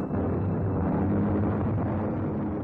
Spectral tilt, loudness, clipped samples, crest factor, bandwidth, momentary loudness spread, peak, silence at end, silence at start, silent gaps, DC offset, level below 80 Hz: -12.5 dB/octave; -27 LUFS; under 0.1%; 8 dB; 3.7 kHz; 4 LU; -18 dBFS; 0 s; 0 s; none; under 0.1%; -46 dBFS